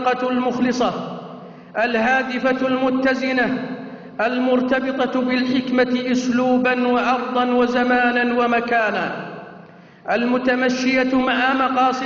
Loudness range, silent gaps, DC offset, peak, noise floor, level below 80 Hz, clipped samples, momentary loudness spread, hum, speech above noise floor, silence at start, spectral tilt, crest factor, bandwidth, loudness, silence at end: 2 LU; none; under 0.1%; -8 dBFS; -43 dBFS; -56 dBFS; under 0.1%; 12 LU; none; 25 dB; 0 s; -2.5 dB/octave; 12 dB; 7.2 kHz; -19 LUFS; 0 s